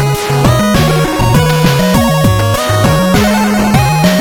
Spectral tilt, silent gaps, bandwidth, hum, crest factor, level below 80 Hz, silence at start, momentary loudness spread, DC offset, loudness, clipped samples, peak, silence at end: -5.5 dB/octave; none; 18.5 kHz; none; 10 dB; -24 dBFS; 0 s; 2 LU; under 0.1%; -10 LUFS; under 0.1%; 0 dBFS; 0 s